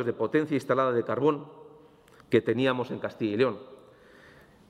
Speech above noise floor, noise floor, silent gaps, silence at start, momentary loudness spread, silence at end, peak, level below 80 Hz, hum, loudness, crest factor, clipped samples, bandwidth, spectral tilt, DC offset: 29 dB; -56 dBFS; none; 0 s; 9 LU; 0.95 s; -10 dBFS; -70 dBFS; none; -27 LUFS; 20 dB; under 0.1%; 12.5 kHz; -7 dB/octave; under 0.1%